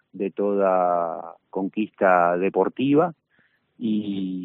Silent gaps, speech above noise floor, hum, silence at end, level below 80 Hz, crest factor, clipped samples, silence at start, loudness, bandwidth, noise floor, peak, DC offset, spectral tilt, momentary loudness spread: none; 43 dB; none; 0 s; -72 dBFS; 18 dB; under 0.1%; 0.15 s; -23 LUFS; 4 kHz; -65 dBFS; -6 dBFS; under 0.1%; -5.5 dB/octave; 11 LU